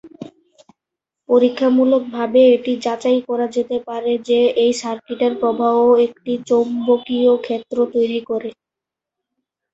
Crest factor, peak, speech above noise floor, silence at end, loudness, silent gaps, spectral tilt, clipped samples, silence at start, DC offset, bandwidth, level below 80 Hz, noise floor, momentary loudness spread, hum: 16 dB; -2 dBFS; 69 dB; 1.2 s; -17 LUFS; none; -5 dB/octave; under 0.1%; 0.05 s; under 0.1%; 8 kHz; -62 dBFS; -85 dBFS; 11 LU; none